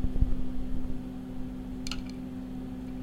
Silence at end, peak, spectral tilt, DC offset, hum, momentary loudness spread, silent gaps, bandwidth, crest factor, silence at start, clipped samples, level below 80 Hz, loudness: 0 s; -10 dBFS; -6.5 dB/octave; under 0.1%; none; 7 LU; none; 11 kHz; 20 dB; 0 s; under 0.1%; -34 dBFS; -37 LUFS